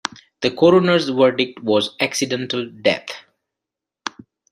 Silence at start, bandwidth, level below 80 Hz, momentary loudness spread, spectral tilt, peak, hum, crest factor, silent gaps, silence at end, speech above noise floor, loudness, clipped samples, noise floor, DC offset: 0.4 s; 13 kHz; -62 dBFS; 18 LU; -4.5 dB/octave; 0 dBFS; none; 20 dB; none; 0.4 s; 68 dB; -18 LUFS; under 0.1%; -85 dBFS; under 0.1%